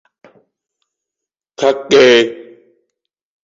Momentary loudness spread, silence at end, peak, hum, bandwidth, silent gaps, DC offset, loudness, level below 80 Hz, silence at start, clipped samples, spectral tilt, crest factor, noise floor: 13 LU; 1 s; 0 dBFS; none; 7.8 kHz; none; under 0.1%; -11 LUFS; -62 dBFS; 1.6 s; under 0.1%; -3.5 dB/octave; 16 dB; -84 dBFS